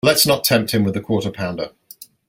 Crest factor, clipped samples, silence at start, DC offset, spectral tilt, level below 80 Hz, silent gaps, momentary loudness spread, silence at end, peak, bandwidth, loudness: 18 dB; under 0.1%; 0.05 s; under 0.1%; -4 dB/octave; -54 dBFS; none; 13 LU; 0.25 s; 0 dBFS; 17 kHz; -18 LUFS